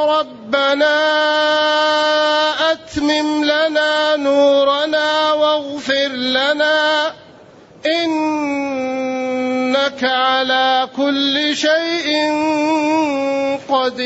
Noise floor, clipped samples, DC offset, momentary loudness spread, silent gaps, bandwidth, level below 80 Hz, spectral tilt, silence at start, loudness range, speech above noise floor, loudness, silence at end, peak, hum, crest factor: -43 dBFS; under 0.1%; under 0.1%; 6 LU; none; 8 kHz; -56 dBFS; -2.5 dB/octave; 0 s; 3 LU; 27 dB; -16 LUFS; 0 s; -4 dBFS; none; 12 dB